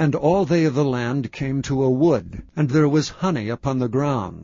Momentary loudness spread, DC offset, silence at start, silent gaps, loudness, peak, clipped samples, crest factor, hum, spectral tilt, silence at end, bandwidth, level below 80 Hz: 7 LU; under 0.1%; 0 s; none; -21 LUFS; -6 dBFS; under 0.1%; 14 dB; none; -7 dB/octave; 0 s; 7.6 kHz; -46 dBFS